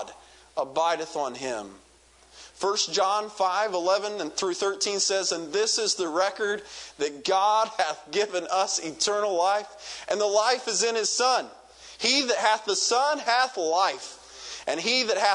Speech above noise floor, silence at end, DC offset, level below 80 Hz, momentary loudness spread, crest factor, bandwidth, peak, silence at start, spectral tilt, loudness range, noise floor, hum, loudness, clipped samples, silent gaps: 30 dB; 0 s; under 0.1%; -68 dBFS; 11 LU; 20 dB; 11 kHz; -6 dBFS; 0 s; -0.5 dB/octave; 4 LU; -56 dBFS; none; -25 LUFS; under 0.1%; none